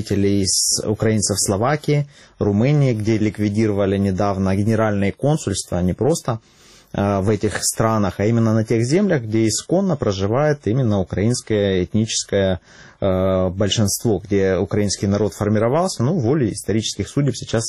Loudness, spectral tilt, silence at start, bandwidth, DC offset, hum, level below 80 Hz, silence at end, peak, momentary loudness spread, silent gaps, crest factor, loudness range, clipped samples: -19 LUFS; -5 dB/octave; 0 s; 14 kHz; 0.2%; none; -46 dBFS; 0 s; -2 dBFS; 4 LU; none; 16 dB; 2 LU; under 0.1%